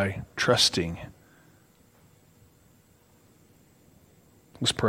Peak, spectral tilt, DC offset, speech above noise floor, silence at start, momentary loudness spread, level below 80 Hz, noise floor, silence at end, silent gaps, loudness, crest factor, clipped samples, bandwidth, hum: -8 dBFS; -3 dB/octave; under 0.1%; 34 dB; 0 s; 19 LU; -58 dBFS; -60 dBFS; 0 s; none; -25 LUFS; 24 dB; under 0.1%; 16 kHz; none